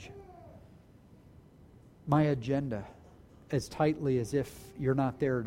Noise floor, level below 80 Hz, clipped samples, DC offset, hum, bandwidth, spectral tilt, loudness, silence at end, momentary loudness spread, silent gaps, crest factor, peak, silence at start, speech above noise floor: -57 dBFS; -58 dBFS; under 0.1%; under 0.1%; none; 16 kHz; -7.5 dB/octave; -32 LUFS; 0 s; 22 LU; none; 20 dB; -12 dBFS; 0 s; 27 dB